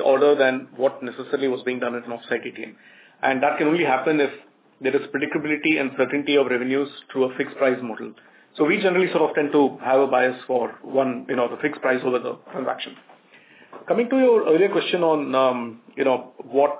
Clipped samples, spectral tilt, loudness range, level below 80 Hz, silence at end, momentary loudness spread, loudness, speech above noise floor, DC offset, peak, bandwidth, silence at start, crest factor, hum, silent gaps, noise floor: under 0.1%; -9 dB/octave; 4 LU; -78 dBFS; 0 s; 10 LU; -22 LUFS; 30 dB; under 0.1%; -6 dBFS; 4 kHz; 0 s; 16 dB; none; none; -51 dBFS